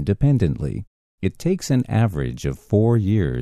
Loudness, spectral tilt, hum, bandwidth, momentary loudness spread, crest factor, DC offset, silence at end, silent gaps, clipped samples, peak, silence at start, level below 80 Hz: -21 LUFS; -7.5 dB/octave; none; 13 kHz; 10 LU; 14 dB; under 0.1%; 0 s; 0.87-1.18 s; under 0.1%; -6 dBFS; 0 s; -36 dBFS